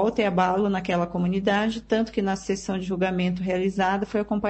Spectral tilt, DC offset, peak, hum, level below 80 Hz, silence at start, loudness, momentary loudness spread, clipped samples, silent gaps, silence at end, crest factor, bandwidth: -6 dB/octave; under 0.1%; -8 dBFS; none; -50 dBFS; 0 s; -25 LUFS; 4 LU; under 0.1%; none; 0 s; 16 dB; 8.6 kHz